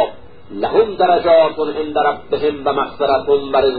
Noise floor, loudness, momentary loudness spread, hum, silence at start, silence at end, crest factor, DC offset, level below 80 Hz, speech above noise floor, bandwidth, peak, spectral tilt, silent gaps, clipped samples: -35 dBFS; -16 LUFS; 9 LU; none; 0 s; 0 s; 14 dB; 1%; -46 dBFS; 20 dB; 5 kHz; -2 dBFS; -10 dB/octave; none; under 0.1%